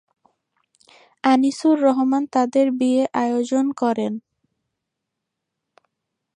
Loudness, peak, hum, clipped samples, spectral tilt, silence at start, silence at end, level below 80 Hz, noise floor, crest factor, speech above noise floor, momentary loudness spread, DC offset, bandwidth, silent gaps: -20 LUFS; -4 dBFS; none; under 0.1%; -5 dB/octave; 1.25 s; 2.15 s; -76 dBFS; -81 dBFS; 18 dB; 62 dB; 6 LU; under 0.1%; 10.5 kHz; none